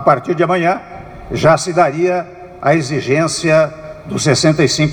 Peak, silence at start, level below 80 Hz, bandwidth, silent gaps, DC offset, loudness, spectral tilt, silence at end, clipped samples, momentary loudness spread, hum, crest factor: 0 dBFS; 0 s; -44 dBFS; 17 kHz; none; under 0.1%; -14 LUFS; -5 dB/octave; 0 s; under 0.1%; 13 LU; none; 14 dB